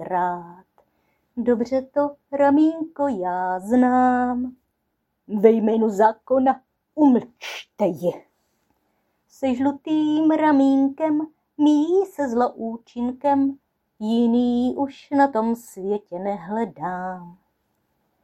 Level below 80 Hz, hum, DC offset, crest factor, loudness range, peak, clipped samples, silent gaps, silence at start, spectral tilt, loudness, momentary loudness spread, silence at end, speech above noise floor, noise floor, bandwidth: -62 dBFS; none; under 0.1%; 20 dB; 4 LU; -2 dBFS; under 0.1%; none; 0 s; -7 dB/octave; -21 LUFS; 13 LU; 0.9 s; 54 dB; -74 dBFS; 13 kHz